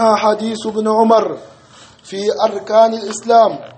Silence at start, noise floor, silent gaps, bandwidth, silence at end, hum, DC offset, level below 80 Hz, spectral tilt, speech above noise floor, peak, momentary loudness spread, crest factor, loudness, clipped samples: 0 s; -43 dBFS; none; 8.8 kHz; 0.05 s; none; under 0.1%; -64 dBFS; -4.5 dB/octave; 29 dB; 0 dBFS; 11 LU; 14 dB; -14 LUFS; under 0.1%